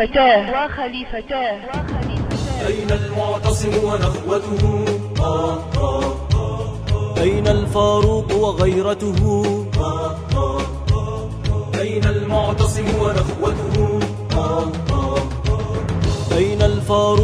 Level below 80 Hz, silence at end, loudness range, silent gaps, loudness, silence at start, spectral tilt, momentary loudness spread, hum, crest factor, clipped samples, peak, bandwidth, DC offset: -28 dBFS; 0 s; 3 LU; none; -19 LUFS; 0 s; -6.5 dB/octave; 7 LU; none; 16 dB; under 0.1%; -2 dBFS; 12.5 kHz; under 0.1%